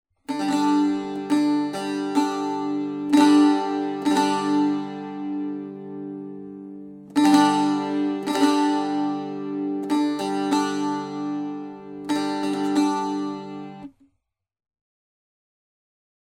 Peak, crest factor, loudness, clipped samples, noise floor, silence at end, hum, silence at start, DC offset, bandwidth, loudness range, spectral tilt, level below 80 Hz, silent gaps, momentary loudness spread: -4 dBFS; 18 dB; -23 LUFS; under 0.1%; -76 dBFS; 2.4 s; none; 0.3 s; under 0.1%; 12.5 kHz; 6 LU; -5 dB/octave; -70 dBFS; none; 17 LU